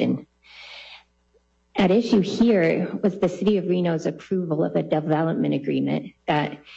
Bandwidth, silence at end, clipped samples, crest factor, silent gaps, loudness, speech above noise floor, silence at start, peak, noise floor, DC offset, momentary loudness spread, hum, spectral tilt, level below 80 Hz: 8 kHz; 0 s; under 0.1%; 14 dB; none; -23 LUFS; 42 dB; 0 s; -8 dBFS; -64 dBFS; under 0.1%; 14 LU; none; -7.5 dB/octave; -58 dBFS